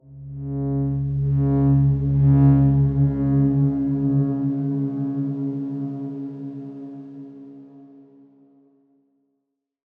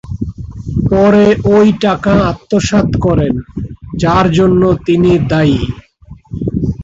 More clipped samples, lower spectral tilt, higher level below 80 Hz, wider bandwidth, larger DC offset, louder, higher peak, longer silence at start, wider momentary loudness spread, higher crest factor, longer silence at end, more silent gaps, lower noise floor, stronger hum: neither; first, -13.5 dB/octave vs -7 dB/octave; second, -40 dBFS vs -28 dBFS; second, 2.2 kHz vs 7.8 kHz; neither; second, -21 LUFS vs -11 LUFS; second, -6 dBFS vs 0 dBFS; about the same, 0.1 s vs 0.05 s; first, 20 LU vs 15 LU; first, 16 dB vs 10 dB; first, 2.15 s vs 0 s; neither; first, -77 dBFS vs -37 dBFS; neither